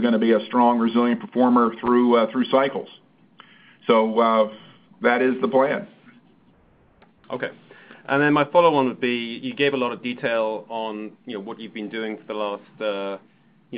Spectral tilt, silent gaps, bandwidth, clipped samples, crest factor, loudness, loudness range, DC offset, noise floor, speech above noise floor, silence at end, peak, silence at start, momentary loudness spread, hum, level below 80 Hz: -10 dB/octave; none; 5 kHz; under 0.1%; 20 dB; -21 LUFS; 7 LU; under 0.1%; -57 dBFS; 36 dB; 0 s; -2 dBFS; 0 s; 15 LU; none; -68 dBFS